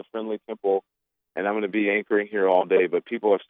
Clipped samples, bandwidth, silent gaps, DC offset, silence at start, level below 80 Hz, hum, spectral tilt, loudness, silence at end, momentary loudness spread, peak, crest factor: under 0.1%; 3.9 kHz; none; under 0.1%; 0.15 s; -86 dBFS; none; -8.5 dB/octave; -24 LUFS; 0.05 s; 11 LU; -6 dBFS; 18 dB